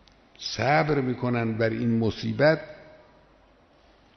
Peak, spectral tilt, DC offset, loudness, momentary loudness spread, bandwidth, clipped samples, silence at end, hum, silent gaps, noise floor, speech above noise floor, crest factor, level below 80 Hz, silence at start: -8 dBFS; -5 dB/octave; under 0.1%; -25 LUFS; 9 LU; 6.4 kHz; under 0.1%; 1.25 s; none; none; -58 dBFS; 34 dB; 18 dB; -56 dBFS; 0.4 s